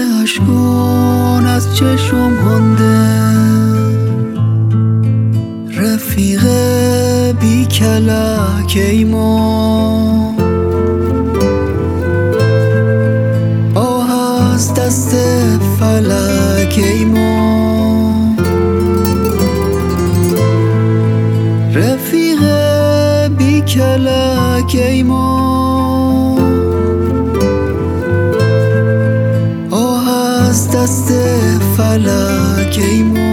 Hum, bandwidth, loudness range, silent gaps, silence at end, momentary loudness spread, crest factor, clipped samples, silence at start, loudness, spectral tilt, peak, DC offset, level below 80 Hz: none; 18 kHz; 2 LU; none; 0 s; 3 LU; 10 dB; under 0.1%; 0 s; -12 LUFS; -6 dB/octave; 0 dBFS; under 0.1%; -36 dBFS